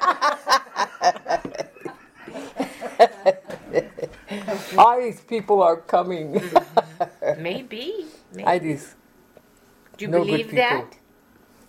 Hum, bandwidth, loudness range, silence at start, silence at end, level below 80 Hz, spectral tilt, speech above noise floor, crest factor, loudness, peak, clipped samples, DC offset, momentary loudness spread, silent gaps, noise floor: none; 16 kHz; 6 LU; 0 s; 0.8 s; -62 dBFS; -4.5 dB/octave; 35 dB; 20 dB; -22 LUFS; -2 dBFS; under 0.1%; under 0.1%; 17 LU; none; -55 dBFS